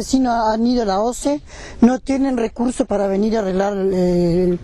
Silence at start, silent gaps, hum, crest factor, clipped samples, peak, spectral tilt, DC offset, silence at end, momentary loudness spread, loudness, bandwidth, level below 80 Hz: 0 s; none; none; 14 dB; under 0.1%; -4 dBFS; -6.5 dB/octave; under 0.1%; 0 s; 5 LU; -18 LUFS; 12.5 kHz; -38 dBFS